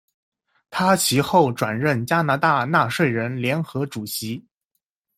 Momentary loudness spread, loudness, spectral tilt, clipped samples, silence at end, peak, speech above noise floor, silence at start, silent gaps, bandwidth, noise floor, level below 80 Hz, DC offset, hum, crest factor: 10 LU; -21 LUFS; -4.5 dB/octave; under 0.1%; 0.8 s; -4 dBFS; 57 dB; 0.7 s; none; 16 kHz; -78 dBFS; -60 dBFS; under 0.1%; none; 18 dB